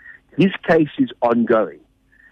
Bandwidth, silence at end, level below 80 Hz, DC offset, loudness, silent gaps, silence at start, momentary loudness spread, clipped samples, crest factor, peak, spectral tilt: 6.8 kHz; 0.6 s; -58 dBFS; under 0.1%; -18 LUFS; none; 0.05 s; 7 LU; under 0.1%; 14 dB; -6 dBFS; -8.5 dB/octave